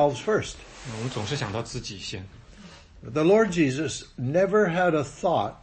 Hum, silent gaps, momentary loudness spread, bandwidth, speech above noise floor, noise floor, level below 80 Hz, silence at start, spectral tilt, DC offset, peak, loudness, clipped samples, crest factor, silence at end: none; none; 17 LU; 8.8 kHz; 23 dB; -48 dBFS; -52 dBFS; 0 s; -5.5 dB/octave; under 0.1%; -10 dBFS; -25 LUFS; under 0.1%; 16 dB; 0.05 s